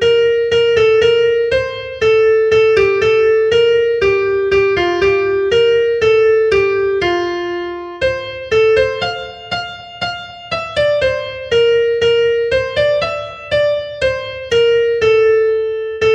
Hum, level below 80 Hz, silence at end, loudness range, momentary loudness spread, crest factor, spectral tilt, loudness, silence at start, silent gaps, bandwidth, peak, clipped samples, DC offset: none; -42 dBFS; 0 s; 5 LU; 11 LU; 12 dB; -4.5 dB/octave; -14 LUFS; 0 s; none; 8 kHz; 0 dBFS; under 0.1%; under 0.1%